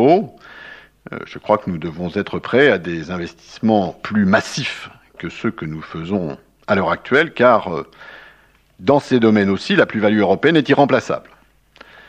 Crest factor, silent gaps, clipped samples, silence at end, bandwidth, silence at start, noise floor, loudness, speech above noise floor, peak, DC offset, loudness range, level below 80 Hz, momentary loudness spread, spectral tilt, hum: 18 dB; none; under 0.1%; 0.9 s; 9.6 kHz; 0 s; -52 dBFS; -17 LUFS; 35 dB; 0 dBFS; under 0.1%; 5 LU; -54 dBFS; 18 LU; -6 dB/octave; none